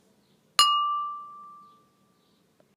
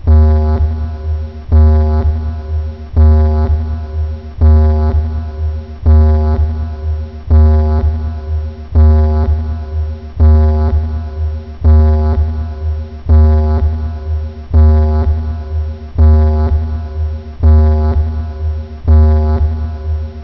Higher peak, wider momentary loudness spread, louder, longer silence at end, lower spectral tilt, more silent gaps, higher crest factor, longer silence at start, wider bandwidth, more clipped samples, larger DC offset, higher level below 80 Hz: about the same, -4 dBFS vs -2 dBFS; first, 23 LU vs 11 LU; second, -24 LUFS vs -13 LUFS; first, 1.2 s vs 0 s; second, 3 dB/octave vs -11 dB/octave; neither; first, 26 dB vs 10 dB; first, 0.6 s vs 0 s; first, 15.5 kHz vs 5.4 kHz; neither; second, under 0.1% vs 1%; second, -90 dBFS vs -12 dBFS